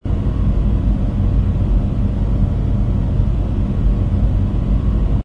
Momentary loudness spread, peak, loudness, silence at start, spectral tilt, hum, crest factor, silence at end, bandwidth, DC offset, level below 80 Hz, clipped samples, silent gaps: 2 LU; -4 dBFS; -18 LUFS; 0 s; -10 dB/octave; none; 12 dB; 0 s; 4.1 kHz; 1%; -18 dBFS; under 0.1%; none